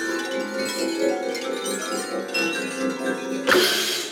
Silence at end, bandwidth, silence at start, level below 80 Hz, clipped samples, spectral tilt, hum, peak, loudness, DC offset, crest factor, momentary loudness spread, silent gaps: 0 s; 18 kHz; 0 s; -70 dBFS; under 0.1%; -2 dB/octave; none; -4 dBFS; -24 LUFS; under 0.1%; 20 dB; 9 LU; none